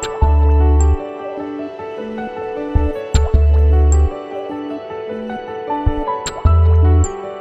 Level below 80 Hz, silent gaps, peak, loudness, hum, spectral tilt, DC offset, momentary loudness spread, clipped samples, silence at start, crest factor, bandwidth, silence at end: -16 dBFS; none; 0 dBFS; -17 LUFS; none; -7 dB/octave; under 0.1%; 13 LU; under 0.1%; 0 s; 14 dB; 8.2 kHz; 0 s